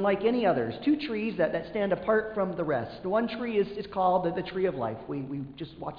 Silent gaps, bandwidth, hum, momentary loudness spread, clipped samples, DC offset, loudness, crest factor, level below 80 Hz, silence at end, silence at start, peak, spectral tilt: none; 5.2 kHz; none; 9 LU; under 0.1%; under 0.1%; -29 LUFS; 16 dB; -58 dBFS; 0 s; 0 s; -14 dBFS; -9 dB/octave